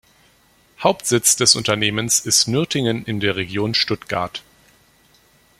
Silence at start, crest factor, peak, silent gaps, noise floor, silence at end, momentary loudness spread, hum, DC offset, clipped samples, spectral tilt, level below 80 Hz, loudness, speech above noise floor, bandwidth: 0.8 s; 20 dB; 0 dBFS; none; -56 dBFS; 1.2 s; 10 LU; none; under 0.1%; under 0.1%; -2.5 dB/octave; -54 dBFS; -18 LUFS; 37 dB; 16.5 kHz